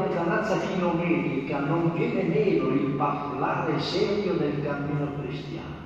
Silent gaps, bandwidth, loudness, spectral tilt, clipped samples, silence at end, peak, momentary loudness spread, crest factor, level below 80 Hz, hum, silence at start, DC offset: none; 8 kHz; -26 LUFS; -7.5 dB/octave; under 0.1%; 0 s; -12 dBFS; 5 LU; 14 dB; -54 dBFS; none; 0 s; under 0.1%